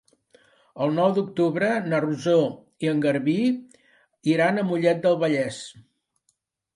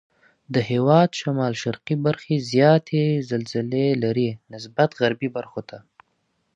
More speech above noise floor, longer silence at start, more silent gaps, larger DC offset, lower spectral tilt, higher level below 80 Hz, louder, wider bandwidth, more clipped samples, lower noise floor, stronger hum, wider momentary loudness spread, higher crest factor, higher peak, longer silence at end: about the same, 50 dB vs 49 dB; first, 0.75 s vs 0.5 s; neither; neither; about the same, -6.5 dB/octave vs -7 dB/octave; second, -70 dBFS vs -64 dBFS; about the same, -23 LUFS vs -22 LUFS; first, 11.5 kHz vs 8.4 kHz; neither; about the same, -72 dBFS vs -71 dBFS; neither; second, 8 LU vs 13 LU; about the same, 16 dB vs 20 dB; second, -8 dBFS vs -2 dBFS; first, 0.95 s vs 0.75 s